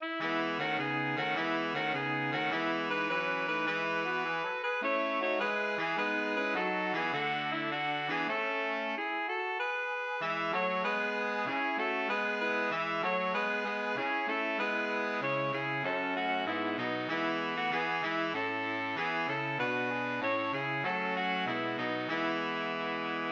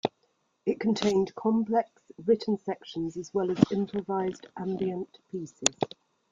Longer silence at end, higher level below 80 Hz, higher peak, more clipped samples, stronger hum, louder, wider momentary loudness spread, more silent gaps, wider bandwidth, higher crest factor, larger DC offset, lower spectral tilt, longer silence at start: second, 0 s vs 0.45 s; second, -82 dBFS vs -66 dBFS; second, -20 dBFS vs -2 dBFS; neither; neither; about the same, -32 LUFS vs -30 LUFS; second, 2 LU vs 11 LU; neither; second, 7.8 kHz vs 9.6 kHz; second, 14 dB vs 26 dB; neither; about the same, -5 dB/octave vs -5 dB/octave; about the same, 0 s vs 0.05 s